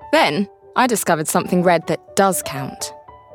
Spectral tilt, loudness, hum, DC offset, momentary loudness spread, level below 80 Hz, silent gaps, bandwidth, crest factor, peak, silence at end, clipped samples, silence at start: -4 dB/octave; -18 LUFS; none; under 0.1%; 11 LU; -58 dBFS; none; 18 kHz; 16 dB; -2 dBFS; 0 s; under 0.1%; 0 s